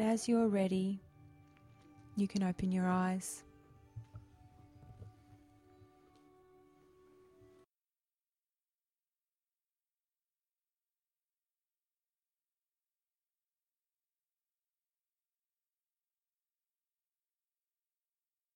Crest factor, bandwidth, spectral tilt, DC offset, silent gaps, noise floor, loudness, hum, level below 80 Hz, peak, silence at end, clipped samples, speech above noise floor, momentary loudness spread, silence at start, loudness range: 20 dB; 13.5 kHz; -6.5 dB/octave; under 0.1%; none; under -90 dBFS; -35 LUFS; none; -70 dBFS; -22 dBFS; 13.45 s; under 0.1%; over 56 dB; 25 LU; 0 s; 23 LU